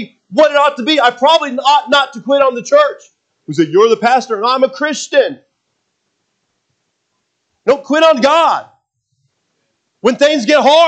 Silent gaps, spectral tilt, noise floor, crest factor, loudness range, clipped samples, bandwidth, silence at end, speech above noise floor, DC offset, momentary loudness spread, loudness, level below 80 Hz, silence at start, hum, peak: none; -3.5 dB/octave; -68 dBFS; 14 dB; 6 LU; under 0.1%; 8.8 kHz; 0 s; 57 dB; under 0.1%; 7 LU; -12 LUFS; -66 dBFS; 0 s; none; 0 dBFS